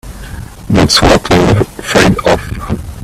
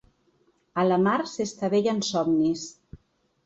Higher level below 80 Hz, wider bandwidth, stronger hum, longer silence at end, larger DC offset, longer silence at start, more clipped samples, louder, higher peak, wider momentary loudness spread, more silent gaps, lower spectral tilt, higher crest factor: first, -24 dBFS vs -62 dBFS; first, 15.5 kHz vs 8.2 kHz; neither; second, 0 s vs 0.5 s; neither; second, 0.05 s vs 0.75 s; first, 0.1% vs under 0.1%; first, -10 LUFS vs -25 LUFS; first, 0 dBFS vs -12 dBFS; first, 20 LU vs 11 LU; neither; about the same, -5 dB/octave vs -5.5 dB/octave; about the same, 10 dB vs 14 dB